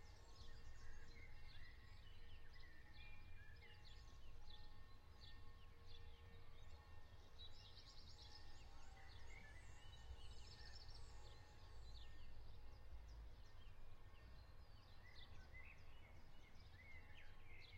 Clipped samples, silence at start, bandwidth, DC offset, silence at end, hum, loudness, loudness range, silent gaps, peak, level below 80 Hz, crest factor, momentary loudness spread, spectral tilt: under 0.1%; 0 s; 8.8 kHz; under 0.1%; 0 s; none; -64 LUFS; 3 LU; none; -42 dBFS; -62 dBFS; 14 dB; 5 LU; -4 dB/octave